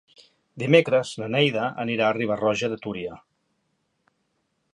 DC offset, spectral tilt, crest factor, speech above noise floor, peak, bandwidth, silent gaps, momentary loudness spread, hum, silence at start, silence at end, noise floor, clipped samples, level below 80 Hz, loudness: under 0.1%; -5.5 dB/octave; 24 dB; 50 dB; -2 dBFS; 11 kHz; none; 13 LU; none; 0.55 s; 1.55 s; -73 dBFS; under 0.1%; -66 dBFS; -23 LUFS